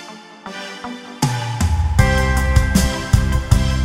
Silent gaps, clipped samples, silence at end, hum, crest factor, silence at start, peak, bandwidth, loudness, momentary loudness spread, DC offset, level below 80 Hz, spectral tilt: none; under 0.1%; 0 s; none; 16 dB; 0 s; 0 dBFS; 16 kHz; -17 LUFS; 15 LU; under 0.1%; -20 dBFS; -5 dB/octave